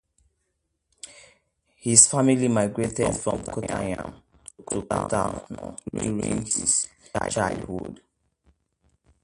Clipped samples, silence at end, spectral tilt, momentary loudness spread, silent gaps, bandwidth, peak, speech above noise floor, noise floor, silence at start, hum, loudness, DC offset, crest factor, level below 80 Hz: under 0.1%; 1.3 s; -3.5 dB/octave; 22 LU; none; 11.5 kHz; 0 dBFS; 52 dB; -76 dBFS; 1.05 s; none; -23 LUFS; under 0.1%; 26 dB; -50 dBFS